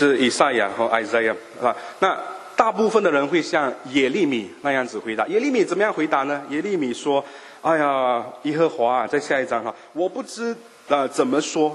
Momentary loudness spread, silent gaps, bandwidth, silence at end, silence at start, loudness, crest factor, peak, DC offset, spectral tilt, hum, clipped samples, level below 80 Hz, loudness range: 8 LU; none; 12 kHz; 0 s; 0 s; -22 LUFS; 22 dB; 0 dBFS; under 0.1%; -4 dB/octave; none; under 0.1%; -68 dBFS; 2 LU